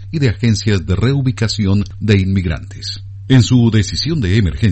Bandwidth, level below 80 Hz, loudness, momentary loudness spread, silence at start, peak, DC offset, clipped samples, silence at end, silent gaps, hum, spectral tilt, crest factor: 8.6 kHz; -32 dBFS; -15 LUFS; 11 LU; 0 s; 0 dBFS; under 0.1%; under 0.1%; 0 s; none; none; -6 dB/octave; 14 dB